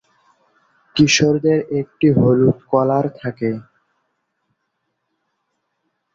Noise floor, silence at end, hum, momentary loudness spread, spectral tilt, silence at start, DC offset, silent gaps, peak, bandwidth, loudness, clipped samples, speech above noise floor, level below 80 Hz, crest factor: -73 dBFS; 2.55 s; none; 11 LU; -5.5 dB/octave; 0.95 s; under 0.1%; none; -2 dBFS; 7.8 kHz; -17 LUFS; under 0.1%; 57 dB; -52 dBFS; 18 dB